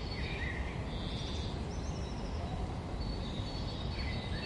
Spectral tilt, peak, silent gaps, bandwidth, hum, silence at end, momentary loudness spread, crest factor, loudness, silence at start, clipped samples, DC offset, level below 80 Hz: -6 dB/octave; -26 dBFS; none; 11.5 kHz; none; 0 s; 2 LU; 12 dB; -39 LUFS; 0 s; under 0.1%; under 0.1%; -42 dBFS